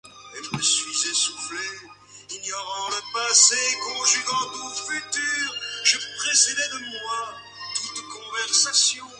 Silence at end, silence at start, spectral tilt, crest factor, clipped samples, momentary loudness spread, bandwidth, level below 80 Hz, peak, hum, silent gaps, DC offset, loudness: 0 s; 0.05 s; 1 dB/octave; 24 dB; under 0.1%; 16 LU; 11.5 kHz; -68 dBFS; -2 dBFS; none; none; under 0.1%; -21 LUFS